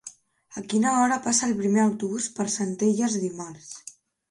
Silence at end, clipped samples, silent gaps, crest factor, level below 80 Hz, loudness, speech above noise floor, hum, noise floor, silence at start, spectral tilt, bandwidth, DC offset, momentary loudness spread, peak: 0.4 s; under 0.1%; none; 16 dB; -68 dBFS; -24 LUFS; 23 dB; none; -48 dBFS; 0.05 s; -4 dB/octave; 11.5 kHz; under 0.1%; 19 LU; -8 dBFS